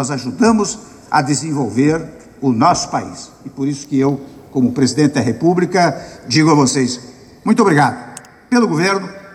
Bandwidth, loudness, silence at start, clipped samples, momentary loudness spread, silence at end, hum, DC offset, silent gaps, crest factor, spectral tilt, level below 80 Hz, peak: 12.5 kHz; -15 LUFS; 0 s; under 0.1%; 15 LU; 0 s; none; under 0.1%; none; 14 dB; -5 dB/octave; -52 dBFS; -2 dBFS